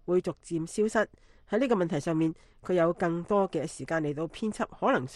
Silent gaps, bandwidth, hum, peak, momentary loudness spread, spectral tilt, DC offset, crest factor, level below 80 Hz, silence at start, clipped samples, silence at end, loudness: none; 12 kHz; none; -12 dBFS; 7 LU; -6.5 dB/octave; under 0.1%; 18 dB; -58 dBFS; 0.05 s; under 0.1%; 0 s; -30 LUFS